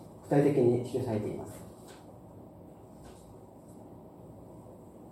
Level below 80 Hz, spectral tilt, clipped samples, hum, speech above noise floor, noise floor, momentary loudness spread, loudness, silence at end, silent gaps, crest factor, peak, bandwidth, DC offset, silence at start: -64 dBFS; -8 dB/octave; under 0.1%; none; 23 dB; -51 dBFS; 25 LU; -29 LUFS; 0 s; none; 20 dB; -14 dBFS; 15 kHz; under 0.1%; 0 s